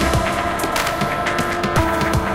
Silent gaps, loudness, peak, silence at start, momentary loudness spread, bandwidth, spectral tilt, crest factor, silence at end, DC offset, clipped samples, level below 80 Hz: none; -19 LUFS; -4 dBFS; 0 s; 2 LU; 17 kHz; -4.5 dB/octave; 14 dB; 0 s; under 0.1%; under 0.1%; -30 dBFS